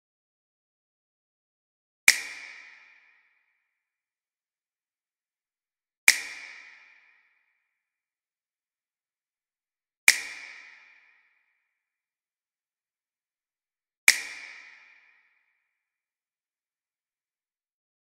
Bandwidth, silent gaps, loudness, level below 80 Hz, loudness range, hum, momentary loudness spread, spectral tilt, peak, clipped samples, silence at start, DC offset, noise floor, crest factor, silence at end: 15.5 kHz; 5.97-6.07 s, 9.97-10.07 s, 13.97-14.07 s; -22 LUFS; -80 dBFS; 1 LU; none; 23 LU; 3.5 dB/octave; 0 dBFS; under 0.1%; 2.1 s; under 0.1%; under -90 dBFS; 34 dB; 3.55 s